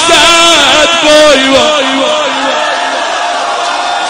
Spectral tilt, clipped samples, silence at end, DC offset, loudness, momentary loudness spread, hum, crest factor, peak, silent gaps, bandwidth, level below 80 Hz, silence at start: -1 dB/octave; 2%; 0 s; under 0.1%; -6 LUFS; 9 LU; none; 8 dB; 0 dBFS; none; over 20 kHz; -38 dBFS; 0 s